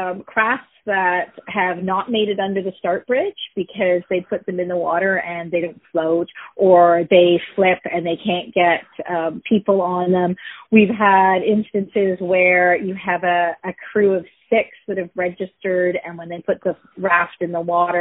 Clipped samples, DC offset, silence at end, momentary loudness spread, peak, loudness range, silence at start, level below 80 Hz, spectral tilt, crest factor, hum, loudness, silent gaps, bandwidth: under 0.1%; under 0.1%; 0 s; 11 LU; 0 dBFS; 5 LU; 0 s; -62 dBFS; -4 dB/octave; 18 dB; none; -18 LUFS; none; 4 kHz